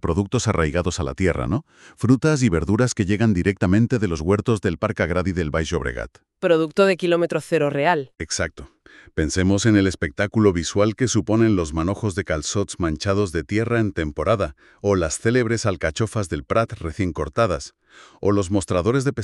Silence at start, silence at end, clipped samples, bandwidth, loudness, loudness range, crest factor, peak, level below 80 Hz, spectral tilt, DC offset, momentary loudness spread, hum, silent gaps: 0.05 s; 0 s; under 0.1%; 12 kHz; -21 LUFS; 3 LU; 18 dB; -4 dBFS; -38 dBFS; -6 dB/octave; under 0.1%; 7 LU; none; none